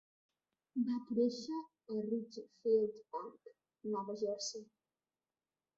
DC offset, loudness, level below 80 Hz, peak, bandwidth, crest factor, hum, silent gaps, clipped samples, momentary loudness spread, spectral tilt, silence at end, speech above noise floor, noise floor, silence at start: under 0.1%; -39 LUFS; -84 dBFS; -22 dBFS; 7.6 kHz; 18 dB; none; none; under 0.1%; 13 LU; -6 dB/octave; 1.15 s; over 52 dB; under -90 dBFS; 0.75 s